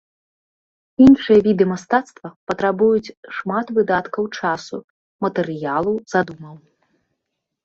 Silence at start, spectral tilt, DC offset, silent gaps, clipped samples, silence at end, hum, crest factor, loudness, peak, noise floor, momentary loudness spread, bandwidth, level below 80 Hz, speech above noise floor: 1 s; -7 dB/octave; under 0.1%; 2.36-2.47 s, 3.17-3.23 s, 4.84-5.19 s; under 0.1%; 1.1 s; none; 18 dB; -18 LUFS; -2 dBFS; -78 dBFS; 19 LU; 7.6 kHz; -54 dBFS; 61 dB